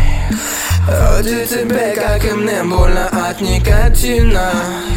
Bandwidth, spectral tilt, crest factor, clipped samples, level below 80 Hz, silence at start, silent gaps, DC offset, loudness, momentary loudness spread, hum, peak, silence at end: 17 kHz; -5 dB/octave; 12 dB; under 0.1%; -14 dBFS; 0 s; none; under 0.1%; -15 LUFS; 4 LU; none; 0 dBFS; 0 s